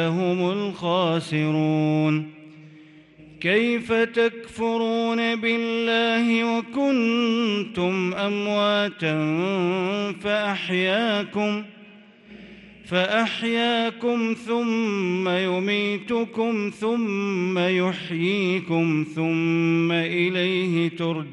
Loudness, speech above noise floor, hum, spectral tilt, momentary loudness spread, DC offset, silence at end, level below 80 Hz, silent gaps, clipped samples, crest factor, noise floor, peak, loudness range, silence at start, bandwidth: -23 LUFS; 26 dB; none; -6 dB/octave; 4 LU; under 0.1%; 0 s; -66 dBFS; none; under 0.1%; 14 dB; -49 dBFS; -8 dBFS; 3 LU; 0 s; 11 kHz